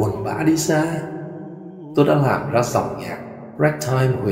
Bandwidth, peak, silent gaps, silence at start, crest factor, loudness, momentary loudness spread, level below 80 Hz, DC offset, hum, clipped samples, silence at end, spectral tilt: 16 kHz; -2 dBFS; none; 0 s; 18 dB; -20 LUFS; 16 LU; -52 dBFS; under 0.1%; none; under 0.1%; 0 s; -6 dB/octave